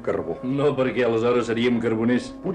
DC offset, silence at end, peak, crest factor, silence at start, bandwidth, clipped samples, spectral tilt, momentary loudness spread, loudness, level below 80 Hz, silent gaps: under 0.1%; 0 s; -12 dBFS; 10 dB; 0 s; 9.8 kHz; under 0.1%; -6.5 dB/octave; 5 LU; -22 LUFS; -52 dBFS; none